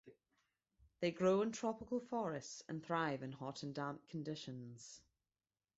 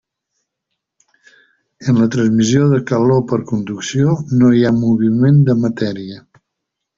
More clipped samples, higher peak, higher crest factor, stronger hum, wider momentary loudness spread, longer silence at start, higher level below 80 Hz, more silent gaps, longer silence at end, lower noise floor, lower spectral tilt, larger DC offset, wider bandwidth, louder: neither; second, -24 dBFS vs 0 dBFS; about the same, 20 dB vs 16 dB; neither; first, 16 LU vs 10 LU; second, 0.05 s vs 1.8 s; second, -78 dBFS vs -50 dBFS; neither; about the same, 0.8 s vs 0.8 s; first, under -90 dBFS vs -78 dBFS; second, -5 dB/octave vs -7 dB/octave; neither; about the same, 8 kHz vs 7.6 kHz; second, -42 LUFS vs -14 LUFS